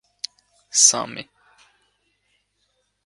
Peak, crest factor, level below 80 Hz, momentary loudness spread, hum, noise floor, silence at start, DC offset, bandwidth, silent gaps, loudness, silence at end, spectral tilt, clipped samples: 0 dBFS; 26 dB; -72 dBFS; 20 LU; 50 Hz at -70 dBFS; -70 dBFS; 0.75 s; under 0.1%; 12 kHz; none; -17 LUFS; 1.85 s; 0.5 dB/octave; under 0.1%